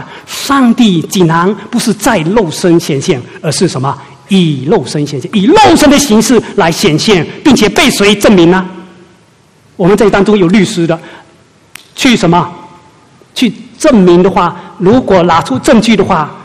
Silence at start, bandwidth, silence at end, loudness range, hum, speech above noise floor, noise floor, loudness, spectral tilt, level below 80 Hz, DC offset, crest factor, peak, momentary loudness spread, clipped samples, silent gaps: 0 s; 15.5 kHz; 0 s; 5 LU; none; 37 dB; -45 dBFS; -8 LUFS; -5 dB/octave; -36 dBFS; under 0.1%; 8 dB; 0 dBFS; 9 LU; 1%; none